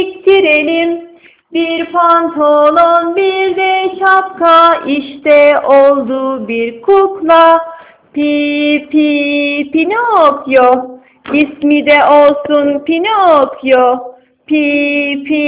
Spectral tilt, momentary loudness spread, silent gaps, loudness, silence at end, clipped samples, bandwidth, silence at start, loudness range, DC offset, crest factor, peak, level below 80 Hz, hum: -7.5 dB/octave; 9 LU; none; -10 LUFS; 0 s; 1%; 4 kHz; 0 s; 2 LU; under 0.1%; 10 dB; 0 dBFS; -54 dBFS; none